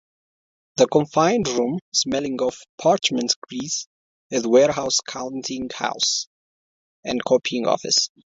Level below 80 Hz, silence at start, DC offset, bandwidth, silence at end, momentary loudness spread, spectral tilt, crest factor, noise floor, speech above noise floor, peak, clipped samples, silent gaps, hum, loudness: -60 dBFS; 0.75 s; under 0.1%; 8 kHz; 0.3 s; 10 LU; -3 dB/octave; 18 dB; under -90 dBFS; over 69 dB; -4 dBFS; under 0.1%; 1.81-1.92 s, 2.69-2.78 s, 3.36-3.42 s, 3.86-4.30 s, 6.27-7.03 s; none; -21 LUFS